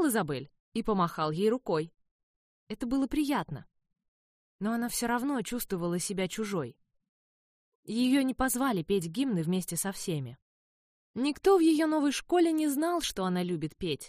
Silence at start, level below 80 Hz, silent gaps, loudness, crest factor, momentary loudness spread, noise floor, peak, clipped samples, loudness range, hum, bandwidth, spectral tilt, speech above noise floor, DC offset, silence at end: 0 s; -56 dBFS; 0.60-0.72 s, 2.11-2.67 s, 4.08-4.59 s, 7.09-7.83 s, 10.42-11.14 s; -30 LUFS; 18 dB; 11 LU; under -90 dBFS; -12 dBFS; under 0.1%; 5 LU; none; 15.5 kHz; -5 dB/octave; over 61 dB; under 0.1%; 0 s